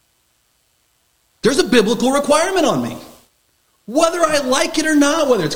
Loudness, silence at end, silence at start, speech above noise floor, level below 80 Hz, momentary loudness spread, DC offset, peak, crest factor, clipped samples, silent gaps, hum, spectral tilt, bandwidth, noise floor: -16 LUFS; 0 s; 1.45 s; 47 dB; -50 dBFS; 8 LU; under 0.1%; 0 dBFS; 18 dB; under 0.1%; none; none; -3.5 dB/octave; 17 kHz; -62 dBFS